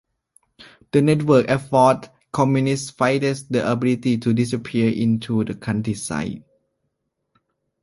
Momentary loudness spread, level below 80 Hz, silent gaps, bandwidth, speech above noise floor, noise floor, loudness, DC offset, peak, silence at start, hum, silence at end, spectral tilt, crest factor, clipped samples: 9 LU; -54 dBFS; none; 11.5 kHz; 56 dB; -75 dBFS; -20 LUFS; under 0.1%; -2 dBFS; 0.6 s; none; 1.45 s; -6.5 dB/octave; 18 dB; under 0.1%